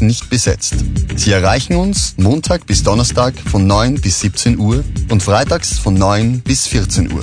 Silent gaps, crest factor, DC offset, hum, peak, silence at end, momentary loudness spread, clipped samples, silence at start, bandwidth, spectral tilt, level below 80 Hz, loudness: none; 12 dB; 0.2%; none; 0 dBFS; 0 s; 4 LU; under 0.1%; 0 s; 10 kHz; -4.5 dB/octave; -22 dBFS; -14 LUFS